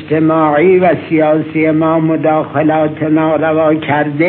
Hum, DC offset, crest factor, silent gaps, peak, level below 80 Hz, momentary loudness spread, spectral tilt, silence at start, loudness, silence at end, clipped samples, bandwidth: none; under 0.1%; 12 dB; none; 0 dBFS; -56 dBFS; 4 LU; -12 dB/octave; 0 s; -12 LUFS; 0 s; under 0.1%; 4.2 kHz